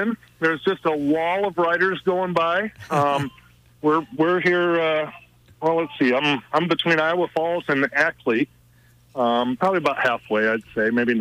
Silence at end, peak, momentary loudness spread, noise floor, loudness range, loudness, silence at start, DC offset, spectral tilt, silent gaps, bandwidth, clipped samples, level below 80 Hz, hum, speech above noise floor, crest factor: 0 s; -6 dBFS; 6 LU; -54 dBFS; 1 LU; -21 LUFS; 0 s; under 0.1%; -6 dB/octave; none; 15 kHz; under 0.1%; -62 dBFS; none; 33 dB; 16 dB